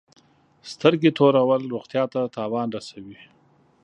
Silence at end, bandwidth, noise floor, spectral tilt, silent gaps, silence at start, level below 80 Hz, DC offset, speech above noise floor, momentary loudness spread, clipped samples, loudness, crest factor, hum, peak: 0.7 s; 9.4 kHz; -59 dBFS; -7 dB/octave; none; 0.65 s; -70 dBFS; under 0.1%; 38 dB; 19 LU; under 0.1%; -22 LUFS; 22 dB; none; 0 dBFS